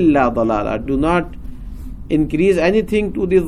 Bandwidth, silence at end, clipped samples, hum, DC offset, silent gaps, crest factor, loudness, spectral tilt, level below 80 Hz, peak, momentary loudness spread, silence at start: 13 kHz; 0 s; under 0.1%; none; under 0.1%; none; 14 dB; -17 LUFS; -7.5 dB/octave; -32 dBFS; -2 dBFS; 20 LU; 0 s